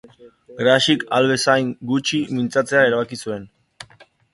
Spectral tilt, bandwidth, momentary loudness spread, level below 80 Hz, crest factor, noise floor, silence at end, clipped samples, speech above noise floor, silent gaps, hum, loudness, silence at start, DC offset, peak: -4 dB/octave; 11.5 kHz; 11 LU; -60 dBFS; 20 dB; -51 dBFS; 0.3 s; under 0.1%; 32 dB; none; none; -18 LUFS; 0.2 s; under 0.1%; 0 dBFS